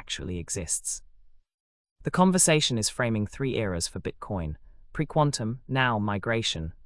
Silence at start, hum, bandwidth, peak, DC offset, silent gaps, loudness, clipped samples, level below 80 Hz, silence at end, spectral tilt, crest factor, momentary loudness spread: 0 s; none; 12 kHz; -8 dBFS; under 0.1%; 1.54-1.85 s, 1.91-1.96 s; -27 LUFS; under 0.1%; -48 dBFS; 0 s; -4 dB/octave; 20 dB; 14 LU